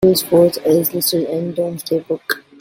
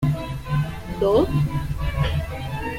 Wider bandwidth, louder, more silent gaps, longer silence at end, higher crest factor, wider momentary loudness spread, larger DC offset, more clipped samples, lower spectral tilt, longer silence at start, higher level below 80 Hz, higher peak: about the same, 17 kHz vs 16 kHz; first, -17 LUFS vs -24 LUFS; neither; first, 0.2 s vs 0 s; about the same, 16 dB vs 16 dB; about the same, 9 LU vs 9 LU; neither; neither; second, -4.5 dB/octave vs -7.5 dB/octave; about the same, 0 s vs 0 s; second, -52 dBFS vs -32 dBFS; first, -2 dBFS vs -6 dBFS